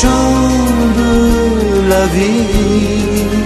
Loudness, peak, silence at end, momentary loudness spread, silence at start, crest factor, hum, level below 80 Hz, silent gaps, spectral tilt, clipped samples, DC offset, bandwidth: -12 LUFS; 0 dBFS; 0 s; 2 LU; 0 s; 10 dB; none; -20 dBFS; none; -5.5 dB/octave; under 0.1%; under 0.1%; 13 kHz